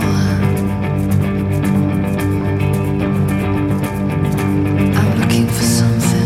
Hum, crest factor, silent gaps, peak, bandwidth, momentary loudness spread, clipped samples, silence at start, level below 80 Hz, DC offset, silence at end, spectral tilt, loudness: none; 12 dB; none; -2 dBFS; 16 kHz; 4 LU; under 0.1%; 0 s; -34 dBFS; under 0.1%; 0 s; -6.5 dB/octave; -16 LUFS